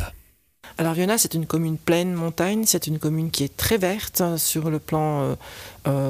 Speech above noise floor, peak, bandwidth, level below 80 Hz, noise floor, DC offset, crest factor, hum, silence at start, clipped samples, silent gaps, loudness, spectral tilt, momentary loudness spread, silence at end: 30 dB; -6 dBFS; 15.5 kHz; -46 dBFS; -52 dBFS; under 0.1%; 16 dB; none; 0 s; under 0.1%; none; -23 LUFS; -4.5 dB/octave; 8 LU; 0 s